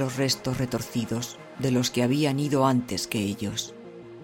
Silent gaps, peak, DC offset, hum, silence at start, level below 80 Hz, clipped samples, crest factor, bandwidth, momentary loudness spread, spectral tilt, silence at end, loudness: none; -10 dBFS; under 0.1%; none; 0 s; -56 dBFS; under 0.1%; 16 dB; 17 kHz; 10 LU; -5 dB/octave; 0 s; -26 LUFS